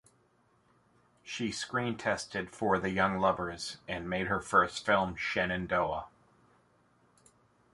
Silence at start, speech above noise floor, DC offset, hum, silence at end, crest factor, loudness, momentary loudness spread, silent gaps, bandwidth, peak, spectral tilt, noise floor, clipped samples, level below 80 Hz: 1.25 s; 38 dB; under 0.1%; none; 1.65 s; 22 dB; -32 LUFS; 11 LU; none; 11.5 kHz; -12 dBFS; -4.5 dB/octave; -69 dBFS; under 0.1%; -58 dBFS